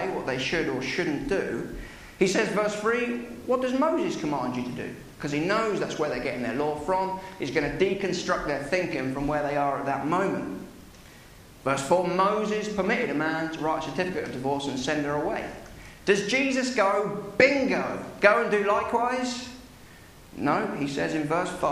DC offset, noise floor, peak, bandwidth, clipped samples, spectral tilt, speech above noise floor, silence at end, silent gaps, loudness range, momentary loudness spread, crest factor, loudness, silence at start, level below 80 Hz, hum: under 0.1%; -49 dBFS; -4 dBFS; 15 kHz; under 0.1%; -5 dB/octave; 23 dB; 0 s; none; 4 LU; 10 LU; 24 dB; -26 LUFS; 0 s; -52 dBFS; none